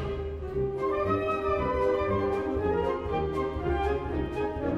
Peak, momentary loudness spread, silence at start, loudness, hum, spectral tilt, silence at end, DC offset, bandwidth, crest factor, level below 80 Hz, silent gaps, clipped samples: -14 dBFS; 5 LU; 0 s; -29 LUFS; none; -8 dB/octave; 0 s; under 0.1%; 8.2 kHz; 14 dB; -40 dBFS; none; under 0.1%